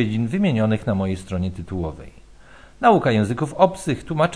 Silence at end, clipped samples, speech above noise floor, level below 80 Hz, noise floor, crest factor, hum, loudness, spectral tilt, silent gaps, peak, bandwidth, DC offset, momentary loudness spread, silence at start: 0 s; under 0.1%; 26 dB; -44 dBFS; -47 dBFS; 20 dB; none; -21 LUFS; -7 dB/octave; none; -2 dBFS; 11 kHz; 0.3%; 11 LU; 0 s